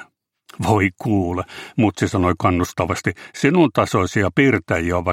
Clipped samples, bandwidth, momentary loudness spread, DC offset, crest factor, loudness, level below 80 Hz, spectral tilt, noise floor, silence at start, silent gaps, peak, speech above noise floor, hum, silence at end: under 0.1%; 16.5 kHz; 8 LU; under 0.1%; 18 dB; -19 LUFS; -44 dBFS; -6.5 dB/octave; -52 dBFS; 0 s; none; -2 dBFS; 33 dB; none; 0 s